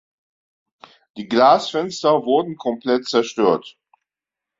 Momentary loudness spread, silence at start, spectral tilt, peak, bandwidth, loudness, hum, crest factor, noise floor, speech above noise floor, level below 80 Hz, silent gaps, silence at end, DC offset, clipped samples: 11 LU; 1.15 s; -4.5 dB/octave; -2 dBFS; 7.8 kHz; -18 LUFS; none; 18 dB; -87 dBFS; 69 dB; -66 dBFS; none; 0.9 s; under 0.1%; under 0.1%